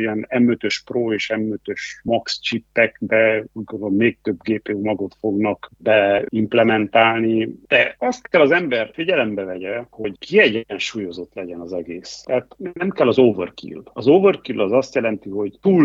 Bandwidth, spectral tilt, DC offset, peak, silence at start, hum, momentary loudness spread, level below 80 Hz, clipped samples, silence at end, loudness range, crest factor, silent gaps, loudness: 7.8 kHz; -5.5 dB/octave; under 0.1%; -2 dBFS; 0 s; none; 14 LU; -60 dBFS; under 0.1%; 0 s; 5 LU; 18 dB; none; -19 LUFS